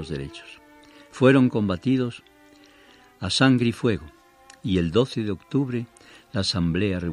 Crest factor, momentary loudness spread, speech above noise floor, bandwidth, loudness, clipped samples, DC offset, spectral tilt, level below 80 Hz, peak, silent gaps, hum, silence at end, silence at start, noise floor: 22 dB; 16 LU; 31 dB; 11 kHz; -23 LUFS; under 0.1%; under 0.1%; -6 dB/octave; -50 dBFS; -2 dBFS; none; none; 0 s; 0 s; -53 dBFS